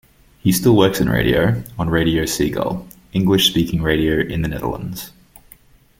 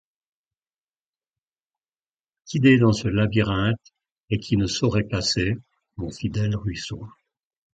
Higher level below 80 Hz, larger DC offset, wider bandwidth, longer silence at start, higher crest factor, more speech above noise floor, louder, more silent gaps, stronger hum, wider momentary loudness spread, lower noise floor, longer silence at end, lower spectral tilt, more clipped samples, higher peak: first, -36 dBFS vs -44 dBFS; neither; first, 17 kHz vs 9 kHz; second, 0.45 s vs 2.45 s; about the same, 18 dB vs 20 dB; second, 31 dB vs over 68 dB; first, -18 LUFS vs -23 LUFS; second, none vs 4.12-4.16 s; neither; second, 11 LU vs 15 LU; second, -49 dBFS vs under -90 dBFS; first, 0.9 s vs 0.65 s; about the same, -5 dB/octave vs -6 dB/octave; neither; first, 0 dBFS vs -6 dBFS